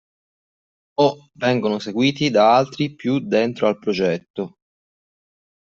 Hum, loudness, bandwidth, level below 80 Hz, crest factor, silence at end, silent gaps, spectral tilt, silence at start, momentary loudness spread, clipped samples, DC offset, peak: none; -20 LUFS; 7.4 kHz; -64 dBFS; 18 dB; 1.15 s; 4.30-4.34 s; -6 dB/octave; 1 s; 12 LU; under 0.1%; under 0.1%; -2 dBFS